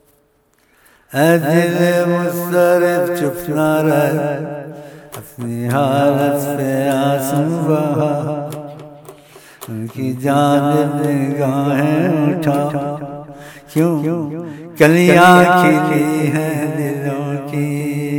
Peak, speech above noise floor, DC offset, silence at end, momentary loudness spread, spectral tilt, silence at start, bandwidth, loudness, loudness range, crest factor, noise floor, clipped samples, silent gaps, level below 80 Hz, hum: 0 dBFS; 43 dB; under 0.1%; 0 s; 16 LU; -6.5 dB/octave; 1.1 s; 19.5 kHz; -15 LUFS; 6 LU; 16 dB; -57 dBFS; under 0.1%; none; -56 dBFS; none